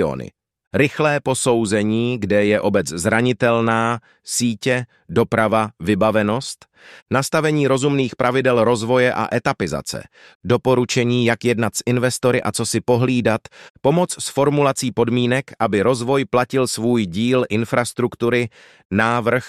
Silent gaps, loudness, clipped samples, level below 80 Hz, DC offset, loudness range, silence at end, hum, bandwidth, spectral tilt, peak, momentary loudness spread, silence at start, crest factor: 0.67-0.71 s, 7.02-7.06 s, 10.35-10.40 s, 13.70-13.74 s, 18.85-18.90 s; -19 LUFS; under 0.1%; -52 dBFS; under 0.1%; 1 LU; 0 s; none; 14.5 kHz; -5 dB/octave; -2 dBFS; 6 LU; 0 s; 16 dB